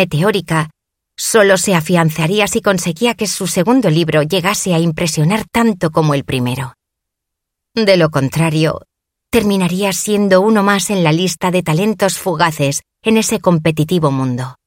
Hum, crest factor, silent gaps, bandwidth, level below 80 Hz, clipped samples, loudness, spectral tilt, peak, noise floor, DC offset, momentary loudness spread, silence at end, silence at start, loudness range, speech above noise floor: none; 14 dB; none; 17 kHz; -46 dBFS; under 0.1%; -14 LUFS; -5 dB/octave; 0 dBFS; -78 dBFS; under 0.1%; 7 LU; 0.15 s; 0 s; 3 LU; 64 dB